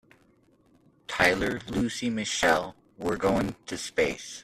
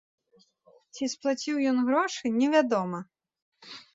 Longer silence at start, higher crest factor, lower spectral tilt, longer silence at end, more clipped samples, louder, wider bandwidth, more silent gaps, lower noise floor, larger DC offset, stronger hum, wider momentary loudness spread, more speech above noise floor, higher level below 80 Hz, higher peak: first, 1.1 s vs 0.95 s; about the same, 24 dB vs 20 dB; about the same, -4 dB/octave vs -4.5 dB/octave; second, 0 s vs 0.15 s; neither; about the same, -27 LUFS vs -27 LUFS; first, 14 kHz vs 7.8 kHz; second, none vs 3.42-3.52 s; about the same, -63 dBFS vs -63 dBFS; neither; neither; second, 12 LU vs 19 LU; about the same, 36 dB vs 37 dB; first, -50 dBFS vs -76 dBFS; about the same, -6 dBFS vs -8 dBFS